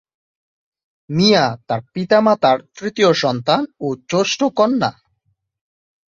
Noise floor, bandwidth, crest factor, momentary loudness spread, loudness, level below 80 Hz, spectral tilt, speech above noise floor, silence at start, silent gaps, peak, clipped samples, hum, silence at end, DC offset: -68 dBFS; 7.8 kHz; 18 dB; 11 LU; -17 LUFS; -58 dBFS; -5 dB/octave; 51 dB; 1.1 s; none; -2 dBFS; under 0.1%; none; 1.2 s; under 0.1%